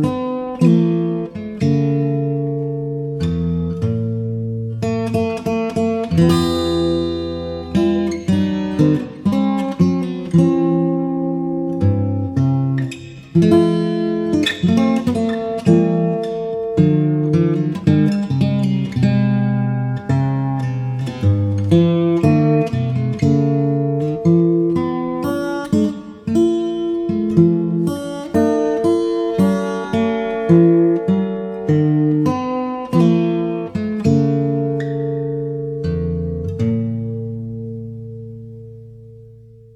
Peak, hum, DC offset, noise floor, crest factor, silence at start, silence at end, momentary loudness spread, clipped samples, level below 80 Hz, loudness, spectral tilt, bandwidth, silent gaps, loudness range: -2 dBFS; none; under 0.1%; -42 dBFS; 16 dB; 0 s; 0.3 s; 9 LU; under 0.1%; -44 dBFS; -18 LUFS; -8.5 dB/octave; 12 kHz; none; 5 LU